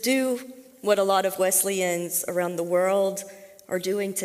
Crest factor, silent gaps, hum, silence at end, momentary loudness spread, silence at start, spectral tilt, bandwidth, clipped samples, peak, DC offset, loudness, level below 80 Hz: 16 dB; none; none; 0 s; 11 LU; 0 s; -3 dB/octave; 16 kHz; under 0.1%; -8 dBFS; under 0.1%; -24 LUFS; -74 dBFS